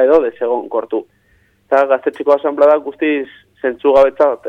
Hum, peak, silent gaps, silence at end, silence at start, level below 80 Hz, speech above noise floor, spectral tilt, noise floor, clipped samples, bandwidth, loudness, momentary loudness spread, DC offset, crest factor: none; -2 dBFS; none; 0 s; 0 s; -54 dBFS; 42 dB; -6 dB/octave; -55 dBFS; under 0.1%; 6 kHz; -15 LUFS; 11 LU; under 0.1%; 14 dB